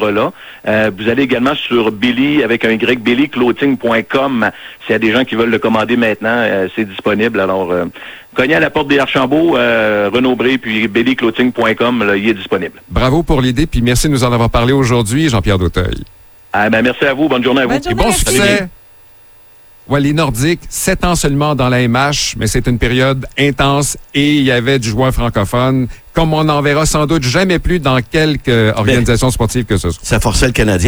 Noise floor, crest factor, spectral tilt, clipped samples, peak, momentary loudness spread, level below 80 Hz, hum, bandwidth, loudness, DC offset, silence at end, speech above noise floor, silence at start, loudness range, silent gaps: -40 dBFS; 12 dB; -5 dB/octave; under 0.1%; 0 dBFS; 5 LU; -26 dBFS; none; over 20 kHz; -13 LUFS; under 0.1%; 0 s; 28 dB; 0 s; 2 LU; none